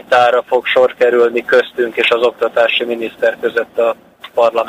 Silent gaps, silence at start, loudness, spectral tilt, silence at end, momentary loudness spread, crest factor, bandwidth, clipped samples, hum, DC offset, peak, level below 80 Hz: none; 0.1 s; -14 LUFS; -3.5 dB/octave; 0 s; 7 LU; 12 dB; 15.5 kHz; under 0.1%; none; under 0.1%; 0 dBFS; -60 dBFS